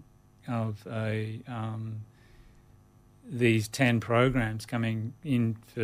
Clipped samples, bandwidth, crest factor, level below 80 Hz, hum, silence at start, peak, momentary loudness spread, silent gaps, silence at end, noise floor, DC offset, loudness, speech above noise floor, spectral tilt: under 0.1%; 15 kHz; 18 dB; -54 dBFS; none; 0.45 s; -12 dBFS; 13 LU; none; 0 s; -58 dBFS; under 0.1%; -29 LUFS; 29 dB; -6.5 dB/octave